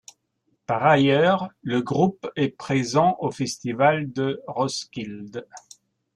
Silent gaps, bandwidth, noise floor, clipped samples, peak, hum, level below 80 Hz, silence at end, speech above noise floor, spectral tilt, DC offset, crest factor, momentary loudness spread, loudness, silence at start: none; 12 kHz; -72 dBFS; under 0.1%; -4 dBFS; none; -62 dBFS; 0.55 s; 49 dB; -5.5 dB/octave; under 0.1%; 18 dB; 16 LU; -22 LUFS; 0.7 s